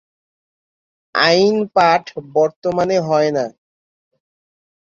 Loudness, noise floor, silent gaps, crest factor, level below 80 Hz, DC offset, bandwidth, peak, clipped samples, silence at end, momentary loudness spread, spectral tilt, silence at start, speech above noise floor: -16 LUFS; under -90 dBFS; 2.56-2.62 s; 18 dB; -60 dBFS; under 0.1%; 7.6 kHz; 0 dBFS; under 0.1%; 1.4 s; 9 LU; -5 dB/octave; 1.15 s; over 74 dB